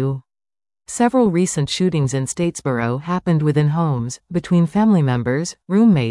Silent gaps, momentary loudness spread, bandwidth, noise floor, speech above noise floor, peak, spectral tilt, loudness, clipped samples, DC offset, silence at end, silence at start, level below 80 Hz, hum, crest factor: none; 9 LU; 12 kHz; under -90 dBFS; over 73 dB; -4 dBFS; -6.5 dB/octave; -18 LUFS; under 0.1%; under 0.1%; 0 s; 0 s; -50 dBFS; none; 14 dB